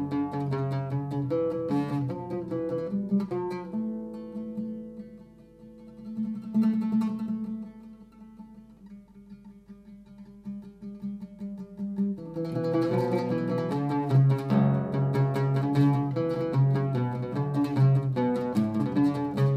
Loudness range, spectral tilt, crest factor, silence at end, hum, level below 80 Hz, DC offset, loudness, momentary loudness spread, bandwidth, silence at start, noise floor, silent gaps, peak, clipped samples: 15 LU; -9.5 dB/octave; 16 dB; 0 s; none; -62 dBFS; under 0.1%; -28 LUFS; 20 LU; 8.4 kHz; 0 s; -50 dBFS; none; -12 dBFS; under 0.1%